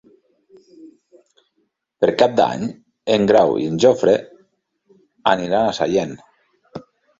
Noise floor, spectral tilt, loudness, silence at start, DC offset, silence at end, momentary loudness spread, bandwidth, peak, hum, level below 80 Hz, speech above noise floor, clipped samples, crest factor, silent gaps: -69 dBFS; -5.5 dB/octave; -18 LUFS; 0.8 s; under 0.1%; 0.4 s; 23 LU; 7.8 kHz; 0 dBFS; none; -56 dBFS; 53 dB; under 0.1%; 20 dB; none